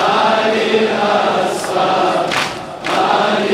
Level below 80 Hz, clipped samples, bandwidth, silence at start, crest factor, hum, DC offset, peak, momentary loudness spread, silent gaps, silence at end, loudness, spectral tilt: -54 dBFS; under 0.1%; 16 kHz; 0 s; 12 dB; none; under 0.1%; -2 dBFS; 5 LU; none; 0 s; -15 LUFS; -4 dB/octave